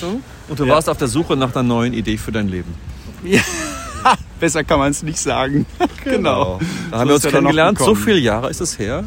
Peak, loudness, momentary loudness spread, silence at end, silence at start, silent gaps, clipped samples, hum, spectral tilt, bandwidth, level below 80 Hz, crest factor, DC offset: 0 dBFS; -17 LUFS; 11 LU; 0 s; 0 s; none; under 0.1%; none; -4.5 dB/octave; 16.5 kHz; -36 dBFS; 16 dB; under 0.1%